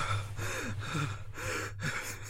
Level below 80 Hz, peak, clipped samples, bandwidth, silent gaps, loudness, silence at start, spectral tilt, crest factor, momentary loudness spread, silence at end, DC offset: -48 dBFS; -20 dBFS; under 0.1%; 16 kHz; none; -36 LUFS; 0 s; -4 dB/octave; 16 dB; 2 LU; 0 s; under 0.1%